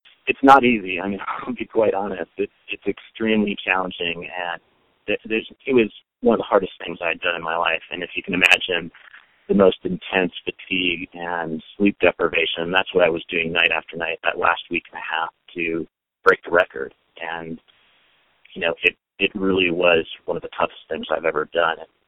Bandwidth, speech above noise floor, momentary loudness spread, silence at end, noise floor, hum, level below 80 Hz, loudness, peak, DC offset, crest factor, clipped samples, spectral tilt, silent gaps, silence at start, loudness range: 15 kHz; 40 dB; 12 LU; 0.25 s; -61 dBFS; none; -54 dBFS; -21 LUFS; 0 dBFS; under 0.1%; 22 dB; under 0.1%; -5 dB/octave; none; 0.25 s; 4 LU